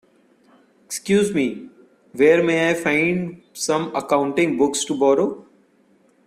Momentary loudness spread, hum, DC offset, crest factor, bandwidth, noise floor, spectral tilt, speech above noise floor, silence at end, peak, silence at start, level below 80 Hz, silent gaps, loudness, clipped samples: 14 LU; none; under 0.1%; 18 dB; 15 kHz; -58 dBFS; -4.5 dB/octave; 39 dB; 0.85 s; -4 dBFS; 0.9 s; -62 dBFS; none; -19 LUFS; under 0.1%